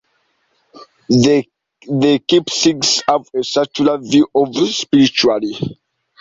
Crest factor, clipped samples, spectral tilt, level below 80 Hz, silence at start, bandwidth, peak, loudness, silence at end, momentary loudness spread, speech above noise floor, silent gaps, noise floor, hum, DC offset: 14 dB; under 0.1%; -4.5 dB/octave; -54 dBFS; 0.8 s; 7.8 kHz; 0 dBFS; -15 LUFS; 0.5 s; 7 LU; 49 dB; none; -63 dBFS; none; under 0.1%